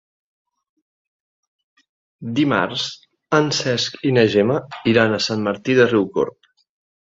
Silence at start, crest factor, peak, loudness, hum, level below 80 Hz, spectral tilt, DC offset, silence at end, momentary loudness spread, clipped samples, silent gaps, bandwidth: 2.2 s; 20 dB; -2 dBFS; -19 LUFS; none; -58 dBFS; -5 dB/octave; under 0.1%; 0.7 s; 9 LU; under 0.1%; none; 7.8 kHz